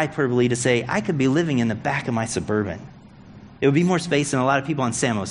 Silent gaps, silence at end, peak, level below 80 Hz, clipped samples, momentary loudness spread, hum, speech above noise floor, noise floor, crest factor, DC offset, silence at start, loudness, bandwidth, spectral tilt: none; 0 s; -6 dBFS; -54 dBFS; under 0.1%; 5 LU; none; 23 dB; -44 dBFS; 16 dB; under 0.1%; 0 s; -22 LUFS; 11 kHz; -5.5 dB/octave